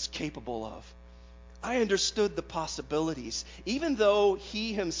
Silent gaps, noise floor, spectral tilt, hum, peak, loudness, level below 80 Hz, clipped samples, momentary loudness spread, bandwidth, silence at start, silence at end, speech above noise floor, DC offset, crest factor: none; -50 dBFS; -3.5 dB/octave; none; -12 dBFS; -30 LUFS; -52 dBFS; under 0.1%; 12 LU; 7.6 kHz; 0 s; 0 s; 20 dB; under 0.1%; 18 dB